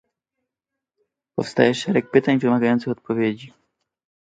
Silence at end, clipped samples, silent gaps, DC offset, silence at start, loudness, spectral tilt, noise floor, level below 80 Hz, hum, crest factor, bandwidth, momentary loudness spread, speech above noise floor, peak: 0.85 s; under 0.1%; none; under 0.1%; 1.35 s; -20 LUFS; -6.5 dB/octave; -85 dBFS; -64 dBFS; none; 22 dB; 9.2 kHz; 10 LU; 65 dB; -2 dBFS